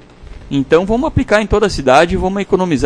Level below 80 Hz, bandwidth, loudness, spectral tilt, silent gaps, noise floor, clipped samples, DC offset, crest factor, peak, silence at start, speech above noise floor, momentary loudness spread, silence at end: -28 dBFS; 11 kHz; -13 LUFS; -6 dB/octave; none; -34 dBFS; 0.2%; under 0.1%; 14 dB; 0 dBFS; 0.2 s; 21 dB; 6 LU; 0 s